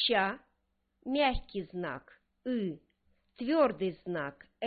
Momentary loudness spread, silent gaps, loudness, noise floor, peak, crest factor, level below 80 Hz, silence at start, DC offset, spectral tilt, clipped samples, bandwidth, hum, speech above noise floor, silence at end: 16 LU; none; -33 LUFS; -78 dBFS; -14 dBFS; 20 dB; -52 dBFS; 0 s; under 0.1%; -8.5 dB/octave; under 0.1%; 4.9 kHz; none; 46 dB; 0 s